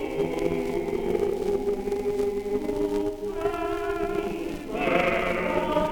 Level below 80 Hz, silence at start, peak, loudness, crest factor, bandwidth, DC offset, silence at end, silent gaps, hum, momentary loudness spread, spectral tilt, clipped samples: -42 dBFS; 0 s; -8 dBFS; -27 LUFS; 18 dB; 20 kHz; under 0.1%; 0 s; none; none; 5 LU; -6 dB/octave; under 0.1%